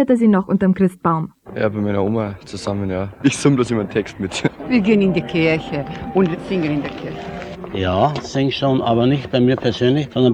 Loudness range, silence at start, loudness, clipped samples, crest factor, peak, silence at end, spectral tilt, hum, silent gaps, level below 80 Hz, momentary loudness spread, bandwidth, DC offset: 2 LU; 0 s; -18 LUFS; under 0.1%; 16 dB; -2 dBFS; 0 s; -6.5 dB/octave; none; none; -46 dBFS; 10 LU; 11.5 kHz; under 0.1%